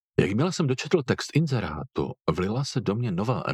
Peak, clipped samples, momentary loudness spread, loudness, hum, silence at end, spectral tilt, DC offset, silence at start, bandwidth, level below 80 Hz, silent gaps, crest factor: -4 dBFS; under 0.1%; 5 LU; -26 LUFS; none; 0 s; -6 dB/octave; under 0.1%; 0.2 s; 13 kHz; -50 dBFS; none; 20 dB